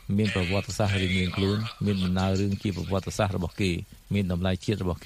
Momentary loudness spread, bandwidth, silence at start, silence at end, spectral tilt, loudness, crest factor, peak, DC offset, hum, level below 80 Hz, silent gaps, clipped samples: 4 LU; 15 kHz; 0.05 s; 0 s; -6 dB/octave; -27 LUFS; 16 dB; -10 dBFS; under 0.1%; none; -48 dBFS; none; under 0.1%